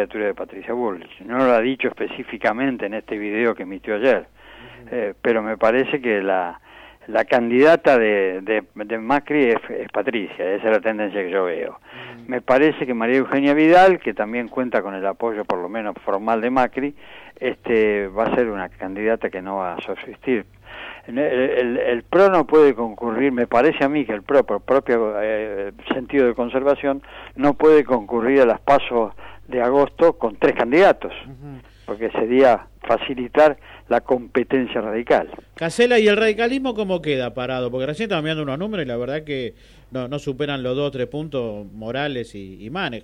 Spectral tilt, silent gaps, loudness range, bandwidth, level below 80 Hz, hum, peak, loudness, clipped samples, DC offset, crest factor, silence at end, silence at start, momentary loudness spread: -6.5 dB/octave; none; 6 LU; 11 kHz; -50 dBFS; none; -6 dBFS; -20 LUFS; under 0.1%; under 0.1%; 14 dB; 0.05 s; 0 s; 14 LU